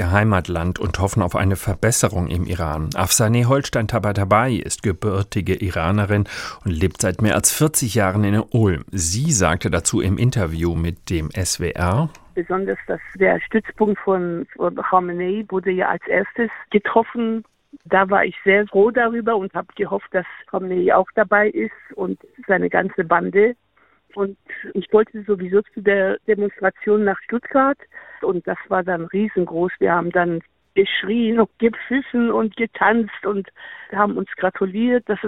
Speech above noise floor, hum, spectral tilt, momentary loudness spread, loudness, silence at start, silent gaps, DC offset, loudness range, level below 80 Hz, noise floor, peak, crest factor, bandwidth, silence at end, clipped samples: 39 dB; none; -5 dB/octave; 9 LU; -20 LUFS; 0 s; none; under 0.1%; 3 LU; -44 dBFS; -58 dBFS; -2 dBFS; 18 dB; 16.5 kHz; 0 s; under 0.1%